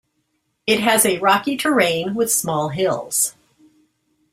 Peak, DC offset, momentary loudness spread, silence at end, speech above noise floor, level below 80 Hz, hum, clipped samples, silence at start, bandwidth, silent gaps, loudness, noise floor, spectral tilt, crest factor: -2 dBFS; under 0.1%; 7 LU; 1 s; 52 dB; -60 dBFS; none; under 0.1%; 0.65 s; 16 kHz; none; -18 LUFS; -70 dBFS; -2.5 dB/octave; 20 dB